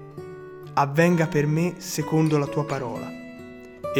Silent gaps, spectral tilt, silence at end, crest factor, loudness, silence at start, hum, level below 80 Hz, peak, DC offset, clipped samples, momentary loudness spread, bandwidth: none; -6.5 dB/octave; 0 s; 18 dB; -23 LUFS; 0 s; none; -58 dBFS; -6 dBFS; under 0.1%; under 0.1%; 20 LU; 18 kHz